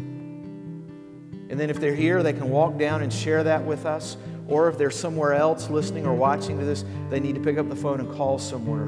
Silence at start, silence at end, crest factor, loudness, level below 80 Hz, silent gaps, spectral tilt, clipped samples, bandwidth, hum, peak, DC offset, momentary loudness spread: 0 s; 0 s; 16 dB; -24 LUFS; -60 dBFS; none; -6.5 dB/octave; under 0.1%; 11 kHz; none; -8 dBFS; under 0.1%; 16 LU